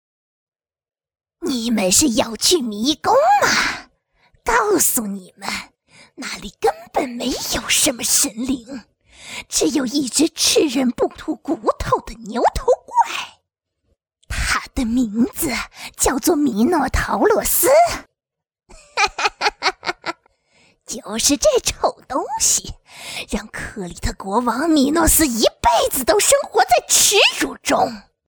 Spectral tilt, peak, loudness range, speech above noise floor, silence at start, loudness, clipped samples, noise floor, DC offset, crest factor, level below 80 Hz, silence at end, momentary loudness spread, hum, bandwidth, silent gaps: -2 dB/octave; 0 dBFS; 6 LU; 63 dB; 1.4 s; -17 LUFS; under 0.1%; -81 dBFS; under 0.1%; 18 dB; -38 dBFS; 0.3 s; 15 LU; none; over 20 kHz; none